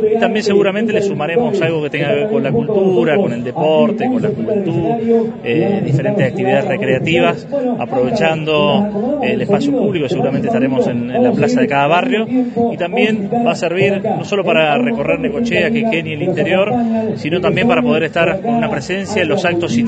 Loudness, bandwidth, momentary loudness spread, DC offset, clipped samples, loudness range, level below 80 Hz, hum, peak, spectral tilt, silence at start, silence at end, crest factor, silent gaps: -15 LUFS; 8.8 kHz; 4 LU; under 0.1%; under 0.1%; 1 LU; -48 dBFS; none; 0 dBFS; -6.5 dB/octave; 0 s; 0 s; 14 dB; none